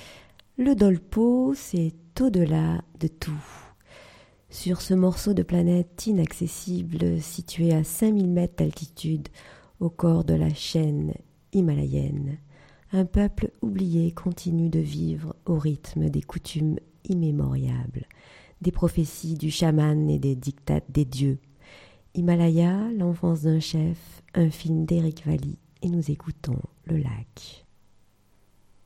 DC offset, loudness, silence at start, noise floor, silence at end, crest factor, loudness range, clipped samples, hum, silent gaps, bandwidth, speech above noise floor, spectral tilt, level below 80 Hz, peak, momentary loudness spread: under 0.1%; -25 LUFS; 0 s; -60 dBFS; 1.3 s; 18 dB; 4 LU; under 0.1%; none; none; 15.5 kHz; 36 dB; -7.5 dB/octave; -44 dBFS; -6 dBFS; 11 LU